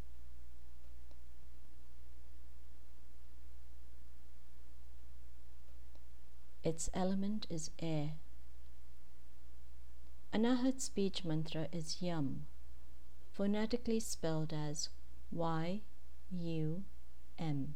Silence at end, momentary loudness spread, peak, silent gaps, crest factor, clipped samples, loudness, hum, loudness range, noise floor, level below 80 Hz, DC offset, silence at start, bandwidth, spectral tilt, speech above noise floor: 0 s; 25 LU; -22 dBFS; none; 20 dB; under 0.1%; -40 LUFS; 60 Hz at -60 dBFS; 22 LU; -60 dBFS; -56 dBFS; 2%; 0 s; 19 kHz; -5.5 dB/octave; 21 dB